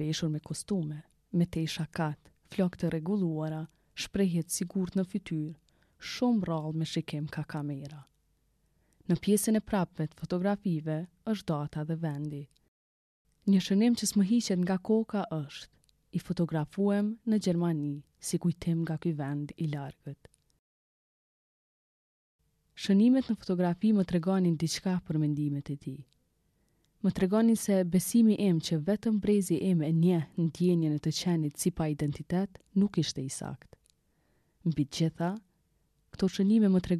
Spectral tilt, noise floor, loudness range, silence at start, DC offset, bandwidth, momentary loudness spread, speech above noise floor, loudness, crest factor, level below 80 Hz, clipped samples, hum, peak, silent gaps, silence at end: -6.5 dB/octave; -73 dBFS; 7 LU; 0 s; under 0.1%; 13.5 kHz; 13 LU; 43 dB; -30 LUFS; 16 dB; -60 dBFS; under 0.1%; none; -14 dBFS; 12.68-13.25 s, 20.59-22.39 s; 0 s